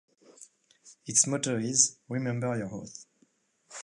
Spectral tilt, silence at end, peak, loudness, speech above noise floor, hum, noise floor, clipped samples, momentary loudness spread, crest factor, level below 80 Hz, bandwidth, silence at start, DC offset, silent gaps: -3 dB/octave; 0 s; -6 dBFS; -27 LUFS; 40 dB; none; -69 dBFS; under 0.1%; 22 LU; 26 dB; -72 dBFS; 11.5 kHz; 0.4 s; under 0.1%; none